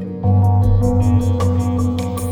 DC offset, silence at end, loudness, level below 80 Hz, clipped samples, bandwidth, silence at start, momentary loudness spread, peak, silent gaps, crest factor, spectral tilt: under 0.1%; 0 s; -16 LUFS; -28 dBFS; under 0.1%; 13 kHz; 0 s; 5 LU; -2 dBFS; none; 12 dB; -8.5 dB/octave